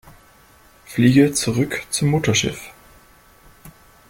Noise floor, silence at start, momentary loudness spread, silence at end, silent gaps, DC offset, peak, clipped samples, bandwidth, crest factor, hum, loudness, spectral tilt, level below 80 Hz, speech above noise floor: -51 dBFS; 0.9 s; 14 LU; 0.4 s; none; under 0.1%; -2 dBFS; under 0.1%; 17 kHz; 18 dB; none; -18 LUFS; -5 dB/octave; -48 dBFS; 33 dB